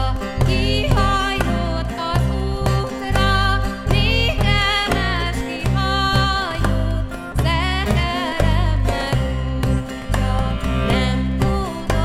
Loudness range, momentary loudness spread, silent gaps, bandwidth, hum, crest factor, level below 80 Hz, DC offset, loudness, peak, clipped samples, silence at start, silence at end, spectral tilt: 2 LU; 6 LU; none; 15 kHz; none; 16 dB; -24 dBFS; under 0.1%; -19 LUFS; -2 dBFS; under 0.1%; 0 s; 0 s; -5.5 dB/octave